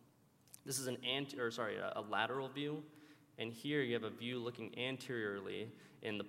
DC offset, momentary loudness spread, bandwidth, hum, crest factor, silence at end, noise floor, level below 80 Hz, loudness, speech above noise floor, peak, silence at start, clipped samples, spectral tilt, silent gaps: under 0.1%; 10 LU; 16 kHz; none; 22 dB; 0 s; -70 dBFS; -88 dBFS; -42 LUFS; 27 dB; -20 dBFS; 0.55 s; under 0.1%; -4 dB/octave; none